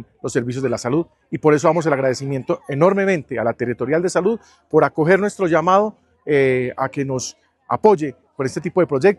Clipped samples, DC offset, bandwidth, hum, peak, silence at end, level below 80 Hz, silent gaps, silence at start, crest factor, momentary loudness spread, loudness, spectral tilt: under 0.1%; under 0.1%; 12 kHz; none; 0 dBFS; 0.05 s; -58 dBFS; none; 0 s; 18 dB; 10 LU; -19 LUFS; -6 dB/octave